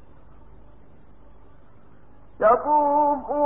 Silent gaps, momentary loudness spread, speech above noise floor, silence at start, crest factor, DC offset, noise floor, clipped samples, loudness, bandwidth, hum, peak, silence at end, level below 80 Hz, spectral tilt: none; 4 LU; 34 dB; 2.4 s; 18 dB; 0.6%; -53 dBFS; under 0.1%; -20 LUFS; 3.4 kHz; none; -6 dBFS; 0 s; -54 dBFS; -10.5 dB/octave